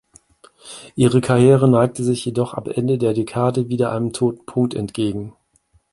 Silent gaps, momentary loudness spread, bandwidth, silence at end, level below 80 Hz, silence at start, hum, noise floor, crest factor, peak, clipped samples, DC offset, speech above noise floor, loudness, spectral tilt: none; 12 LU; 11.5 kHz; 0.6 s; -52 dBFS; 0.65 s; none; -60 dBFS; 18 dB; -2 dBFS; under 0.1%; under 0.1%; 43 dB; -18 LUFS; -7 dB/octave